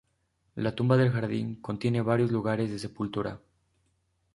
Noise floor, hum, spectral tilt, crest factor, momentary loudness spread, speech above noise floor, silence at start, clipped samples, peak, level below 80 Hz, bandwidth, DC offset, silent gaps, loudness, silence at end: -74 dBFS; none; -8 dB/octave; 20 dB; 11 LU; 46 dB; 0.55 s; under 0.1%; -10 dBFS; -60 dBFS; 11.5 kHz; under 0.1%; none; -29 LUFS; 1 s